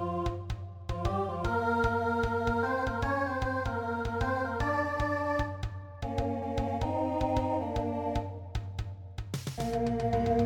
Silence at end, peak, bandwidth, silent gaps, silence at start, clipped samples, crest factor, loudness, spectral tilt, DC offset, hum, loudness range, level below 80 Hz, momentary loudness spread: 0 s; -16 dBFS; 17.5 kHz; none; 0 s; under 0.1%; 14 dB; -32 LUFS; -7 dB/octave; under 0.1%; none; 3 LU; -42 dBFS; 10 LU